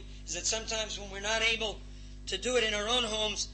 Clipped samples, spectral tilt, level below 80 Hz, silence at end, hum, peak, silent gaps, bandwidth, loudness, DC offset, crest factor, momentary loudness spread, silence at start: under 0.1%; -1 dB/octave; -46 dBFS; 0 s; 50 Hz at -45 dBFS; -16 dBFS; none; 8.8 kHz; -31 LUFS; under 0.1%; 16 dB; 11 LU; 0 s